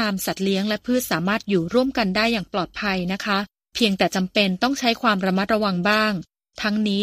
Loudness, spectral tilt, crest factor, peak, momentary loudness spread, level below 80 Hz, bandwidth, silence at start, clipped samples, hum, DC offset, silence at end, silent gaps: -22 LUFS; -4.5 dB/octave; 18 dB; -4 dBFS; 5 LU; -52 dBFS; 15.5 kHz; 0 s; under 0.1%; none; under 0.1%; 0 s; none